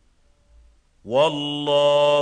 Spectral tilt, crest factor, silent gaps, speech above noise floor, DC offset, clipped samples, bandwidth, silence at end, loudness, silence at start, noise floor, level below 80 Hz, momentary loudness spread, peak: -4.5 dB/octave; 14 dB; none; 40 dB; under 0.1%; under 0.1%; 9.4 kHz; 0 s; -20 LUFS; 1.05 s; -59 dBFS; -58 dBFS; 8 LU; -8 dBFS